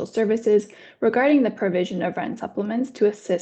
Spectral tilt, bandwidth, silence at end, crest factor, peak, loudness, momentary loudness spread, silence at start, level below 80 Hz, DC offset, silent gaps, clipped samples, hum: -6.5 dB/octave; 8.6 kHz; 0 s; 14 dB; -8 dBFS; -22 LUFS; 10 LU; 0 s; -66 dBFS; under 0.1%; none; under 0.1%; none